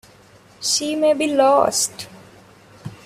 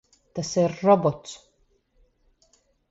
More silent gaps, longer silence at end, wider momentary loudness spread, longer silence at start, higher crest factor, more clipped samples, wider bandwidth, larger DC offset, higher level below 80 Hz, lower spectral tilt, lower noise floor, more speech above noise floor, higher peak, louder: neither; second, 0.1 s vs 1.55 s; about the same, 22 LU vs 21 LU; first, 0.6 s vs 0.35 s; about the same, 18 dB vs 22 dB; neither; first, 16 kHz vs 8 kHz; neither; about the same, -62 dBFS vs -62 dBFS; second, -2.5 dB/octave vs -6 dB/octave; second, -49 dBFS vs -66 dBFS; second, 31 dB vs 43 dB; first, -2 dBFS vs -6 dBFS; first, -18 LUFS vs -23 LUFS